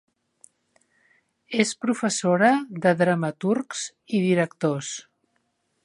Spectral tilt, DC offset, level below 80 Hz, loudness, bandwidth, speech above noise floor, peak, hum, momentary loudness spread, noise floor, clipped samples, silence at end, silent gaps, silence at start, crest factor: -5 dB/octave; under 0.1%; -74 dBFS; -23 LUFS; 11.5 kHz; 49 dB; -4 dBFS; none; 11 LU; -72 dBFS; under 0.1%; 0.85 s; none; 1.5 s; 22 dB